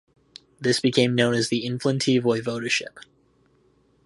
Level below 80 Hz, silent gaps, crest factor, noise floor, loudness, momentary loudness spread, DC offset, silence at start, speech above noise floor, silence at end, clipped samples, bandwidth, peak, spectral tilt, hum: -64 dBFS; none; 20 dB; -62 dBFS; -23 LUFS; 6 LU; under 0.1%; 0.6 s; 39 dB; 1 s; under 0.1%; 11.5 kHz; -4 dBFS; -4.5 dB/octave; none